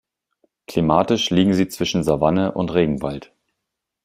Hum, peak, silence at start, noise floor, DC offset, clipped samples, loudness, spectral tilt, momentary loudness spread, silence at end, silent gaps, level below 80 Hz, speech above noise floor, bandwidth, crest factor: none; -2 dBFS; 0.7 s; -81 dBFS; under 0.1%; under 0.1%; -19 LUFS; -6 dB/octave; 9 LU; 0.8 s; none; -48 dBFS; 62 dB; 16 kHz; 18 dB